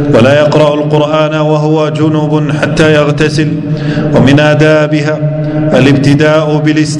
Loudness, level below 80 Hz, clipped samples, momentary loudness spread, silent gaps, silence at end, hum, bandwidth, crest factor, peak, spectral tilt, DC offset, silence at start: -8 LUFS; -36 dBFS; 3%; 6 LU; none; 0 s; none; 10.5 kHz; 8 dB; 0 dBFS; -6.5 dB/octave; under 0.1%; 0 s